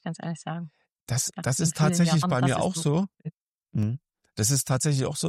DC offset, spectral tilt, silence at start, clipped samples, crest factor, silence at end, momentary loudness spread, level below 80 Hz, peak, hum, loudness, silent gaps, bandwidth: under 0.1%; -5 dB/octave; 0.05 s; under 0.1%; 14 dB; 0 s; 15 LU; -58 dBFS; -12 dBFS; none; -26 LUFS; 0.92-1.07 s, 3.41-3.58 s; 15.5 kHz